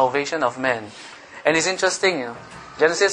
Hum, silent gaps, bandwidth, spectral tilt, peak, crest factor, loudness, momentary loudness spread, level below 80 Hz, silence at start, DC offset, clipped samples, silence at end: none; none; 10.5 kHz; -2.5 dB/octave; -2 dBFS; 20 dB; -21 LUFS; 19 LU; -60 dBFS; 0 s; under 0.1%; under 0.1%; 0 s